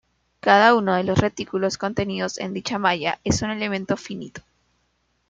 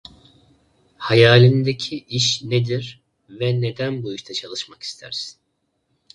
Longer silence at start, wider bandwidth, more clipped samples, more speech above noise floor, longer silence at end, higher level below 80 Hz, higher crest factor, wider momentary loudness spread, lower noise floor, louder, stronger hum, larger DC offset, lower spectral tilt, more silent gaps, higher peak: second, 0.45 s vs 1 s; second, 9.4 kHz vs 10.5 kHz; neither; second, 47 dB vs 52 dB; about the same, 0.9 s vs 0.85 s; first, -50 dBFS vs -58 dBFS; about the same, 20 dB vs 20 dB; second, 12 LU vs 18 LU; about the same, -69 dBFS vs -71 dBFS; about the same, -21 LUFS vs -19 LUFS; first, 60 Hz at -50 dBFS vs none; neither; about the same, -4.5 dB/octave vs -5 dB/octave; neither; about the same, -2 dBFS vs 0 dBFS